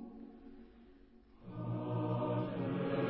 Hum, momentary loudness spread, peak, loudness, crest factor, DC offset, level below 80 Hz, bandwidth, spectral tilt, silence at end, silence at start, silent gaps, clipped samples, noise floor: none; 21 LU; -22 dBFS; -38 LUFS; 18 dB; under 0.1%; -66 dBFS; 4.6 kHz; -7.5 dB/octave; 0 s; 0 s; none; under 0.1%; -61 dBFS